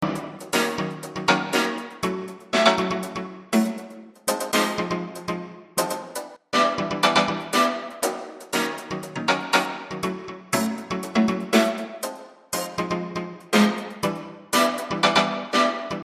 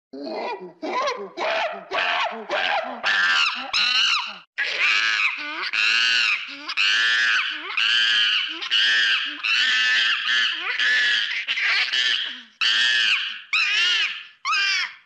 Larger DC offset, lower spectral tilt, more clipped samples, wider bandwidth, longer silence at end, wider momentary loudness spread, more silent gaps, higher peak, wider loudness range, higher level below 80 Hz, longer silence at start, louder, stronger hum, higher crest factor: neither; first, -3.5 dB/octave vs 1 dB/octave; neither; first, 15.5 kHz vs 12 kHz; about the same, 0 s vs 0.1 s; first, 12 LU vs 9 LU; second, none vs 4.47-4.53 s; first, -2 dBFS vs -10 dBFS; about the same, 3 LU vs 3 LU; first, -60 dBFS vs -74 dBFS; second, 0 s vs 0.15 s; second, -24 LUFS vs -20 LUFS; neither; first, 22 dB vs 12 dB